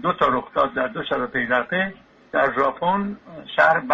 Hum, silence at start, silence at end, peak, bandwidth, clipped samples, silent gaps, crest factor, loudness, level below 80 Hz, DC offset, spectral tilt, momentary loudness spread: none; 0 s; 0 s; -4 dBFS; 7.8 kHz; under 0.1%; none; 18 dB; -22 LUFS; -54 dBFS; under 0.1%; -6.5 dB/octave; 9 LU